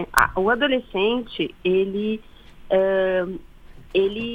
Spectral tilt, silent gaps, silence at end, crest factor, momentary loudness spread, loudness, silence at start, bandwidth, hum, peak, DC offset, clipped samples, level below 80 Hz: -4.5 dB/octave; none; 0 s; 22 dB; 9 LU; -22 LUFS; 0 s; 16.5 kHz; none; 0 dBFS; under 0.1%; under 0.1%; -44 dBFS